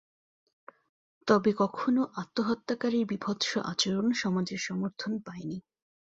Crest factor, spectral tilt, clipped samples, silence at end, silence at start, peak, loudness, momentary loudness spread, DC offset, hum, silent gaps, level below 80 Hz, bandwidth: 20 dB; -5 dB/octave; under 0.1%; 0.55 s; 1.25 s; -10 dBFS; -30 LUFS; 11 LU; under 0.1%; none; none; -70 dBFS; 8 kHz